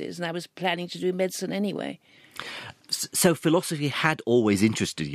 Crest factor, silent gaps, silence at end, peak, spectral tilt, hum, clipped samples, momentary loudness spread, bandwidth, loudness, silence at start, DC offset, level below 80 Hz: 22 dB; none; 0 s; -4 dBFS; -4.5 dB/octave; none; under 0.1%; 15 LU; 15.5 kHz; -25 LUFS; 0 s; under 0.1%; -64 dBFS